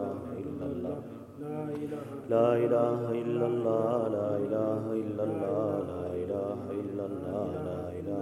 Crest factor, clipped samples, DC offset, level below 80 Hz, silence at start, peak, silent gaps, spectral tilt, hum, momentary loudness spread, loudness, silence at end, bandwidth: 18 dB; under 0.1%; under 0.1%; -68 dBFS; 0 s; -12 dBFS; none; -9 dB/octave; none; 11 LU; -32 LUFS; 0 s; 13.5 kHz